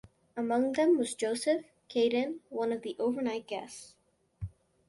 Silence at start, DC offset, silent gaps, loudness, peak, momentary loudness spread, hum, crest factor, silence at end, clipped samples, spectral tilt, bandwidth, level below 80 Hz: 0.35 s; under 0.1%; none; -31 LUFS; -16 dBFS; 18 LU; none; 16 dB; 0.4 s; under 0.1%; -4.5 dB/octave; 11.5 kHz; -62 dBFS